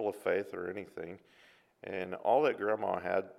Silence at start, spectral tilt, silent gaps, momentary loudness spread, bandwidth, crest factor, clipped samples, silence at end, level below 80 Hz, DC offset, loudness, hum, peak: 0 s; -6 dB/octave; none; 17 LU; 14.5 kHz; 20 dB; under 0.1%; 0.05 s; -78 dBFS; under 0.1%; -34 LUFS; none; -16 dBFS